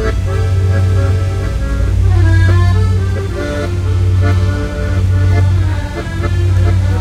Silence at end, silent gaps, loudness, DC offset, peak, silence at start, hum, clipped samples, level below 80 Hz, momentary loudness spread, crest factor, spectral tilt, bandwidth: 0 s; none; -14 LUFS; under 0.1%; 0 dBFS; 0 s; none; under 0.1%; -20 dBFS; 7 LU; 12 dB; -7 dB/octave; 9.4 kHz